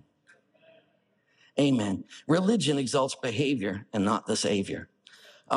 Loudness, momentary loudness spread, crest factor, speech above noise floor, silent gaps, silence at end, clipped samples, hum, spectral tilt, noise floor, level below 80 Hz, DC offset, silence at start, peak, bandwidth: -28 LUFS; 9 LU; 20 dB; 43 dB; none; 0 s; under 0.1%; none; -5 dB/octave; -70 dBFS; -70 dBFS; under 0.1%; 1.55 s; -8 dBFS; 11.5 kHz